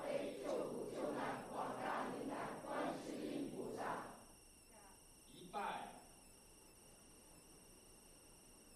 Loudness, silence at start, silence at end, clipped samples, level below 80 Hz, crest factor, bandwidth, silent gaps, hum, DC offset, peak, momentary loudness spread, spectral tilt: -46 LUFS; 0 s; 0 s; under 0.1%; -72 dBFS; 18 dB; 13.5 kHz; none; none; under 0.1%; -30 dBFS; 18 LU; -4.5 dB/octave